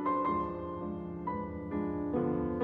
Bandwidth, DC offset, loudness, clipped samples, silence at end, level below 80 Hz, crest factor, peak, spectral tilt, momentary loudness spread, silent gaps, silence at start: 4.5 kHz; under 0.1%; -35 LUFS; under 0.1%; 0 s; -54 dBFS; 14 dB; -20 dBFS; -11 dB/octave; 7 LU; none; 0 s